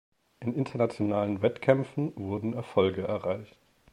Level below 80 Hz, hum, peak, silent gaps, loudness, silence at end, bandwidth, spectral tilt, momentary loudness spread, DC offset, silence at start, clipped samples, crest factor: -66 dBFS; none; -8 dBFS; none; -29 LUFS; 0.45 s; 11 kHz; -8 dB/octave; 8 LU; under 0.1%; 0.4 s; under 0.1%; 22 dB